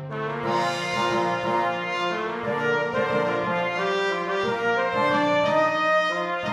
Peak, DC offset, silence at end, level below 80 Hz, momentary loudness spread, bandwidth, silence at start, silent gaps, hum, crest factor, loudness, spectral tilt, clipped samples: -10 dBFS; under 0.1%; 0 s; -62 dBFS; 5 LU; 13 kHz; 0 s; none; none; 14 dB; -24 LUFS; -5 dB/octave; under 0.1%